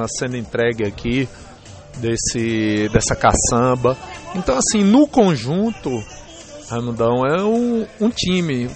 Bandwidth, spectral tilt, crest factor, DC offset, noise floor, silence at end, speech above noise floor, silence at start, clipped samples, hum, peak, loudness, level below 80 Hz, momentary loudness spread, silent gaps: 8.8 kHz; -4.5 dB/octave; 16 dB; under 0.1%; -38 dBFS; 0 s; 20 dB; 0 s; under 0.1%; none; -2 dBFS; -18 LUFS; -36 dBFS; 13 LU; none